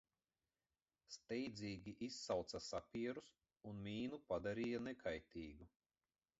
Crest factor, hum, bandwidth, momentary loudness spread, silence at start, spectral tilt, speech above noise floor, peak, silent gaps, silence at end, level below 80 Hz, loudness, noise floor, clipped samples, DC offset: 20 dB; none; 7.6 kHz; 12 LU; 1.1 s; -4.5 dB/octave; over 42 dB; -30 dBFS; none; 0.7 s; -72 dBFS; -48 LUFS; under -90 dBFS; under 0.1%; under 0.1%